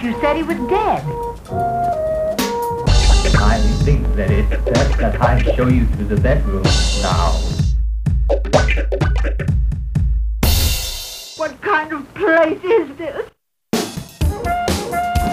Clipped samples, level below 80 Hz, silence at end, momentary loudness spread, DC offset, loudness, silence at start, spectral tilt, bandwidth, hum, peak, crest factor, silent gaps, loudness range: under 0.1%; -20 dBFS; 0 s; 9 LU; under 0.1%; -18 LUFS; 0 s; -5.5 dB/octave; 16 kHz; none; 0 dBFS; 16 dB; none; 3 LU